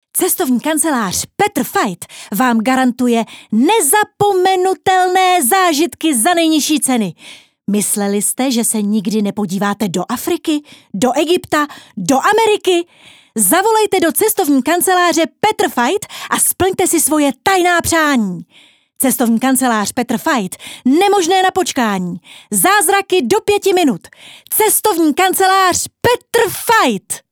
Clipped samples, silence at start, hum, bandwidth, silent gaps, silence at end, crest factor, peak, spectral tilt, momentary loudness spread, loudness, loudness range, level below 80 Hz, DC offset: under 0.1%; 0.15 s; none; over 20 kHz; none; 0.1 s; 14 dB; 0 dBFS; -3 dB/octave; 7 LU; -14 LUFS; 3 LU; -52 dBFS; under 0.1%